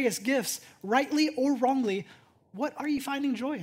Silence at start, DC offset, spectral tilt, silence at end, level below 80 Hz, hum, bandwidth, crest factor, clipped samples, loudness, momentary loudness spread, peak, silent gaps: 0 s; under 0.1%; -3.5 dB/octave; 0 s; -74 dBFS; none; 16 kHz; 18 dB; under 0.1%; -29 LUFS; 9 LU; -10 dBFS; none